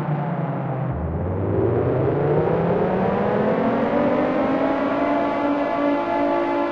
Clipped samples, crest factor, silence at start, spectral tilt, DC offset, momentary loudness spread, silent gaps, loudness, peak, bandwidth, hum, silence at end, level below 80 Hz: under 0.1%; 12 dB; 0 s; -9.5 dB/octave; under 0.1%; 5 LU; none; -21 LUFS; -8 dBFS; 6.6 kHz; none; 0 s; -42 dBFS